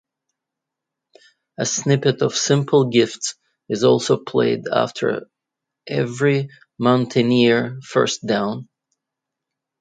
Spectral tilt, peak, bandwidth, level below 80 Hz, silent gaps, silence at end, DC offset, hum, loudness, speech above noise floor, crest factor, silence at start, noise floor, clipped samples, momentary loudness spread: -5 dB/octave; -2 dBFS; 9.4 kHz; -64 dBFS; none; 1.15 s; under 0.1%; none; -19 LUFS; 65 dB; 18 dB; 1.6 s; -84 dBFS; under 0.1%; 11 LU